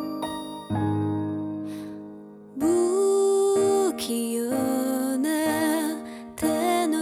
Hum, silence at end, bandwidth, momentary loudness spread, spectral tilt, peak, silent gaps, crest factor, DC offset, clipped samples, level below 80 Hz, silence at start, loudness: none; 0 s; 19 kHz; 15 LU; -5 dB/octave; -12 dBFS; none; 12 dB; under 0.1%; under 0.1%; -62 dBFS; 0 s; -25 LUFS